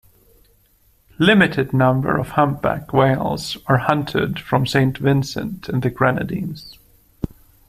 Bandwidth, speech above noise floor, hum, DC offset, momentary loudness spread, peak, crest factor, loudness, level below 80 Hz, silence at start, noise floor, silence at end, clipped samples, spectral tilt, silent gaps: 15 kHz; 39 dB; none; under 0.1%; 12 LU; 0 dBFS; 20 dB; -19 LUFS; -46 dBFS; 1.2 s; -57 dBFS; 0.45 s; under 0.1%; -6.5 dB/octave; none